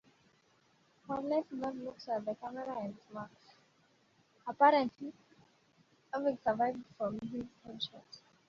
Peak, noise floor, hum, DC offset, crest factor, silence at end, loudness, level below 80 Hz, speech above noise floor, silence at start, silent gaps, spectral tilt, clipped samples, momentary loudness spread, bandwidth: -14 dBFS; -70 dBFS; none; under 0.1%; 24 dB; 0.3 s; -36 LUFS; -76 dBFS; 35 dB; 1.1 s; none; -3 dB/octave; under 0.1%; 20 LU; 7.4 kHz